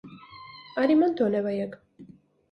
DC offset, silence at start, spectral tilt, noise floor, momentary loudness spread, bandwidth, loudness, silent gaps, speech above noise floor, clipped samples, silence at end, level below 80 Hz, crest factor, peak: under 0.1%; 0.05 s; -8.5 dB/octave; -52 dBFS; 23 LU; 5.6 kHz; -25 LUFS; none; 28 dB; under 0.1%; 0.45 s; -70 dBFS; 18 dB; -10 dBFS